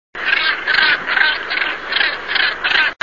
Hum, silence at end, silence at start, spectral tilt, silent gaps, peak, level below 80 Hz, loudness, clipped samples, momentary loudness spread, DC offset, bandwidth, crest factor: none; 0.1 s; 0.15 s; -2 dB/octave; none; -2 dBFS; -52 dBFS; -15 LUFS; under 0.1%; 5 LU; 0.6%; 7.4 kHz; 16 dB